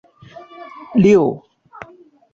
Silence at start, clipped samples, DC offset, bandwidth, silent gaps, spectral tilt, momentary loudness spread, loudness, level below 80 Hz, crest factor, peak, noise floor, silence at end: 0.6 s; under 0.1%; under 0.1%; 7.6 kHz; none; -8 dB/octave; 26 LU; -15 LUFS; -54 dBFS; 16 dB; -2 dBFS; -47 dBFS; 0.95 s